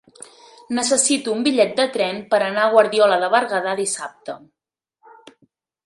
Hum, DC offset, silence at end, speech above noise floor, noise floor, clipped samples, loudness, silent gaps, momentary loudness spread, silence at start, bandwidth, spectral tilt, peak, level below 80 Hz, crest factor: none; under 0.1%; 1.5 s; 47 dB; -65 dBFS; under 0.1%; -18 LUFS; none; 12 LU; 0.7 s; 11.5 kHz; -2 dB/octave; 0 dBFS; -70 dBFS; 20 dB